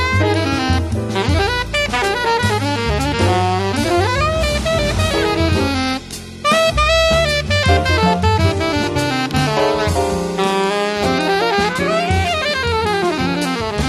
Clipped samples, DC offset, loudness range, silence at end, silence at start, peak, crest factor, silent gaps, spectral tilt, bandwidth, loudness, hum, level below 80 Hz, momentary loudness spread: under 0.1%; under 0.1%; 2 LU; 0 s; 0 s; -2 dBFS; 16 dB; none; -5 dB/octave; 13.5 kHz; -16 LUFS; none; -28 dBFS; 4 LU